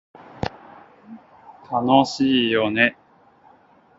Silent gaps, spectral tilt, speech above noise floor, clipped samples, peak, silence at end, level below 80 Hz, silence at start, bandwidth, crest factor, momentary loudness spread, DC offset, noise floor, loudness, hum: none; -5 dB/octave; 35 dB; under 0.1%; 0 dBFS; 1.05 s; -54 dBFS; 0.4 s; 7.8 kHz; 22 dB; 14 LU; under 0.1%; -54 dBFS; -20 LUFS; none